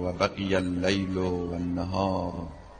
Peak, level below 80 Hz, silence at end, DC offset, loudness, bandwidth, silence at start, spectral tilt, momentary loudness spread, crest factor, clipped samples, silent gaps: -10 dBFS; -48 dBFS; 0 s; under 0.1%; -28 LUFS; 9.4 kHz; 0 s; -6 dB/octave; 5 LU; 18 dB; under 0.1%; none